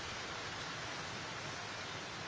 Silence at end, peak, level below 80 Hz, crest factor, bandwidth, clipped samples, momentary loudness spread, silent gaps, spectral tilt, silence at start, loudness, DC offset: 0 s; -30 dBFS; -64 dBFS; 14 dB; 8 kHz; under 0.1%; 1 LU; none; -2.5 dB/octave; 0 s; -42 LUFS; under 0.1%